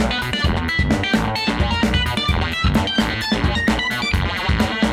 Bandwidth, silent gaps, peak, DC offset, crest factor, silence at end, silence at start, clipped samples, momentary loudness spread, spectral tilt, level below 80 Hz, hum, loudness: 16 kHz; none; -6 dBFS; under 0.1%; 14 dB; 0 s; 0 s; under 0.1%; 2 LU; -5 dB/octave; -26 dBFS; none; -19 LUFS